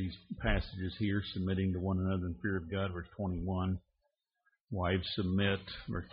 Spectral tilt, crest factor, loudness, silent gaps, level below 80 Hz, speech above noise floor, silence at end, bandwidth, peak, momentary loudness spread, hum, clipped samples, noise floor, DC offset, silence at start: -5.5 dB/octave; 18 dB; -36 LUFS; 4.61-4.67 s; -48 dBFS; 48 dB; 0 s; 5.2 kHz; -18 dBFS; 8 LU; none; under 0.1%; -83 dBFS; under 0.1%; 0 s